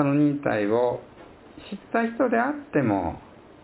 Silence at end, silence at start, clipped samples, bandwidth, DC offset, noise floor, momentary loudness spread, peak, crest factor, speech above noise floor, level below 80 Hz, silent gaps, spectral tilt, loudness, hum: 0.4 s; 0 s; under 0.1%; 4 kHz; under 0.1%; -46 dBFS; 17 LU; -8 dBFS; 16 dB; 23 dB; -52 dBFS; none; -11.5 dB/octave; -25 LUFS; none